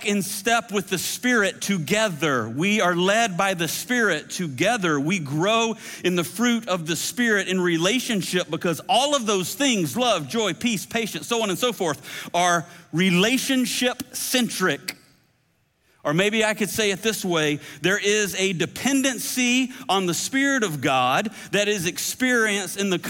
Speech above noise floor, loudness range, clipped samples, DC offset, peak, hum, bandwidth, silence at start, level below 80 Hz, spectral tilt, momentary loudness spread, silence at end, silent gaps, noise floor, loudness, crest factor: 44 dB; 2 LU; under 0.1%; under 0.1%; -6 dBFS; none; 17 kHz; 0 s; -64 dBFS; -3.5 dB/octave; 5 LU; 0 s; none; -66 dBFS; -22 LUFS; 16 dB